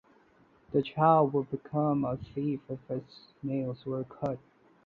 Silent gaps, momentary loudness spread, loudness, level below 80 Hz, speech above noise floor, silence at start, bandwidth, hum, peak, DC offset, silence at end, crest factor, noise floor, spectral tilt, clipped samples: none; 14 LU; -31 LUFS; -64 dBFS; 33 dB; 0.7 s; 5 kHz; none; -10 dBFS; under 0.1%; 0.5 s; 22 dB; -63 dBFS; -10 dB/octave; under 0.1%